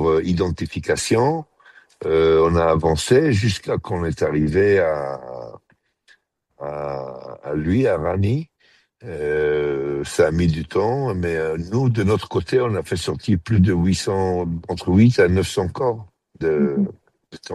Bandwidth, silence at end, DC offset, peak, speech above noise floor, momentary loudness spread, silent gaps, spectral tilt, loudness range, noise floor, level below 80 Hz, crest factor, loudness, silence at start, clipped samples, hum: 12.5 kHz; 0 s; under 0.1%; -4 dBFS; 44 dB; 13 LU; none; -6.5 dB/octave; 6 LU; -63 dBFS; -40 dBFS; 16 dB; -20 LUFS; 0 s; under 0.1%; none